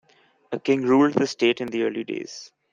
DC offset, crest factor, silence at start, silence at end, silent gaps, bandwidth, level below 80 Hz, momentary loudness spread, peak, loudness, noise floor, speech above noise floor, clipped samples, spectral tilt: under 0.1%; 18 dB; 0.5 s; 0.25 s; none; 7.6 kHz; -66 dBFS; 16 LU; -6 dBFS; -23 LUFS; -45 dBFS; 23 dB; under 0.1%; -5 dB/octave